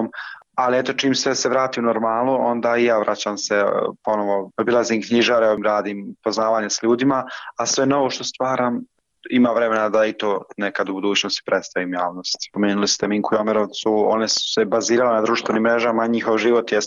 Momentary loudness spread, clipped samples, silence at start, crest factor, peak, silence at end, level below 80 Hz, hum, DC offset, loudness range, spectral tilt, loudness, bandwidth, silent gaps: 7 LU; under 0.1%; 0 s; 12 dB; -8 dBFS; 0 s; -64 dBFS; none; under 0.1%; 2 LU; -3.5 dB/octave; -20 LUFS; 7.6 kHz; none